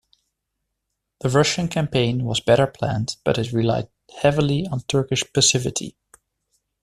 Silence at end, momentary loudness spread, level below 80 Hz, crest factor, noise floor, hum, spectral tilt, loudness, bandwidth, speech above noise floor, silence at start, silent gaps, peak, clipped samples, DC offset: 0.9 s; 10 LU; -50 dBFS; 20 dB; -79 dBFS; none; -4.5 dB/octave; -21 LUFS; 13.5 kHz; 58 dB; 1.25 s; none; -4 dBFS; under 0.1%; under 0.1%